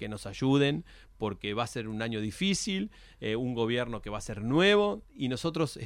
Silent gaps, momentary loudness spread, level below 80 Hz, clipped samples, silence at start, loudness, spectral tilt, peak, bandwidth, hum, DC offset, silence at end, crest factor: none; 13 LU; -54 dBFS; under 0.1%; 0 s; -30 LUFS; -5 dB/octave; -12 dBFS; 15.5 kHz; none; under 0.1%; 0 s; 18 dB